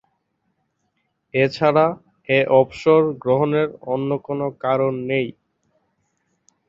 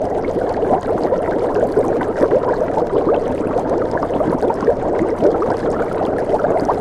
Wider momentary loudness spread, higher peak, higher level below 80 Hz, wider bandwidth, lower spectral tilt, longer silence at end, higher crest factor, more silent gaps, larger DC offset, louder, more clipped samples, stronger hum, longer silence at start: first, 8 LU vs 3 LU; about the same, -2 dBFS vs -2 dBFS; second, -62 dBFS vs -38 dBFS; second, 7.6 kHz vs 11.5 kHz; about the same, -7.5 dB/octave vs -8 dB/octave; first, 1.35 s vs 0 s; about the same, 20 dB vs 16 dB; neither; neither; second, -20 LUFS vs -17 LUFS; neither; neither; first, 1.35 s vs 0 s